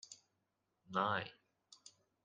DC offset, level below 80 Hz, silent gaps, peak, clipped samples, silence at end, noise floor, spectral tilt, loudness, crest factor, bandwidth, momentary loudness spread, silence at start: under 0.1%; -86 dBFS; none; -20 dBFS; under 0.1%; 0.35 s; -85 dBFS; -4 dB/octave; -40 LUFS; 24 dB; 9.6 kHz; 23 LU; 0.1 s